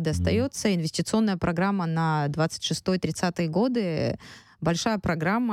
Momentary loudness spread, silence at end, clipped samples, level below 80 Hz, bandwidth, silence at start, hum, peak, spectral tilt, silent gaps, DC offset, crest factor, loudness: 3 LU; 0 s; under 0.1%; -48 dBFS; 14.5 kHz; 0 s; none; -10 dBFS; -5.5 dB/octave; none; under 0.1%; 14 dB; -26 LUFS